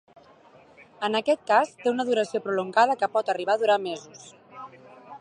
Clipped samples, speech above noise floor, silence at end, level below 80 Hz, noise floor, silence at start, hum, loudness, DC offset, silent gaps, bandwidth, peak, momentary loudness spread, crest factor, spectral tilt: under 0.1%; 29 dB; 0.05 s; -80 dBFS; -54 dBFS; 1 s; none; -24 LUFS; under 0.1%; none; 11 kHz; -6 dBFS; 22 LU; 20 dB; -4 dB/octave